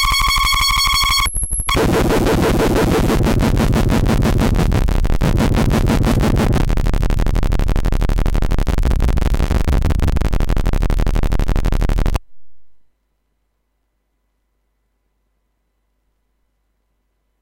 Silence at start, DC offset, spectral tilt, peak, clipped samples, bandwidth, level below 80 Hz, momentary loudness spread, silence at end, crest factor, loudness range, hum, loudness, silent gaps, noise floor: 0 s; 1%; -5 dB/octave; -8 dBFS; under 0.1%; 17 kHz; -18 dBFS; 7 LU; 0 s; 8 dB; 8 LU; none; -17 LUFS; none; -68 dBFS